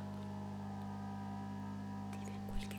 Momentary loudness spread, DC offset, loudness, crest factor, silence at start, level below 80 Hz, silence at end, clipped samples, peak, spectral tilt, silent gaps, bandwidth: 1 LU; under 0.1%; -46 LUFS; 16 dB; 0 s; -56 dBFS; 0 s; under 0.1%; -28 dBFS; -6.5 dB/octave; none; 16 kHz